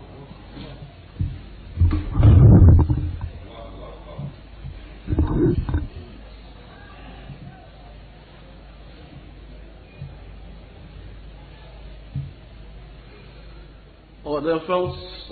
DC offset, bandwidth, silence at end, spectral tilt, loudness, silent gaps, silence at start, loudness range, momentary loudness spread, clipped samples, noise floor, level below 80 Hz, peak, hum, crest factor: under 0.1%; 4.7 kHz; 0 s; -9 dB/octave; -19 LUFS; none; 0.2 s; 25 LU; 27 LU; under 0.1%; -45 dBFS; -28 dBFS; -2 dBFS; none; 22 dB